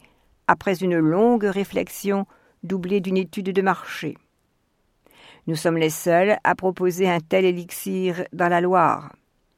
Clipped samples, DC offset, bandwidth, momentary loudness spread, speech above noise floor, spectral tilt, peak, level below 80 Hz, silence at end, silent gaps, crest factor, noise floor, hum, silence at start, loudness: under 0.1%; under 0.1%; 16.5 kHz; 11 LU; 47 dB; -5.5 dB/octave; 0 dBFS; -60 dBFS; 0.5 s; none; 22 dB; -68 dBFS; none; 0.5 s; -22 LUFS